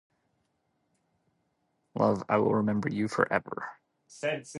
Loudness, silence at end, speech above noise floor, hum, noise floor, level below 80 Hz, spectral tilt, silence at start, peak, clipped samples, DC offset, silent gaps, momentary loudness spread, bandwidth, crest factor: -29 LUFS; 0 s; 48 dB; none; -76 dBFS; -66 dBFS; -6.5 dB/octave; 1.95 s; -8 dBFS; under 0.1%; under 0.1%; none; 14 LU; 11.5 kHz; 24 dB